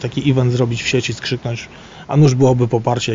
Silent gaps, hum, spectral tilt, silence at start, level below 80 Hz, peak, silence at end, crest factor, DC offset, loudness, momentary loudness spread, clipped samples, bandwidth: none; none; -6 dB/octave; 0 s; -44 dBFS; -2 dBFS; 0 s; 14 dB; under 0.1%; -16 LUFS; 14 LU; under 0.1%; 7.6 kHz